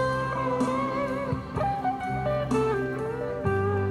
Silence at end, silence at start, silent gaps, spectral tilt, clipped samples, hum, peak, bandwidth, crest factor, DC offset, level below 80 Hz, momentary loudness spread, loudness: 0 s; 0 s; none; -7.5 dB/octave; under 0.1%; none; -12 dBFS; 12.5 kHz; 14 dB; under 0.1%; -46 dBFS; 5 LU; -28 LUFS